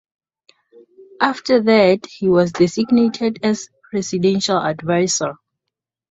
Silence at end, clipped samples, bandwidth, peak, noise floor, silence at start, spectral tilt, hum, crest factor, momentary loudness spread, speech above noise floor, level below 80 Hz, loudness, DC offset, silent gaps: 0.75 s; under 0.1%; 8.2 kHz; -2 dBFS; -82 dBFS; 1 s; -5 dB/octave; none; 18 dB; 9 LU; 65 dB; -58 dBFS; -17 LUFS; under 0.1%; none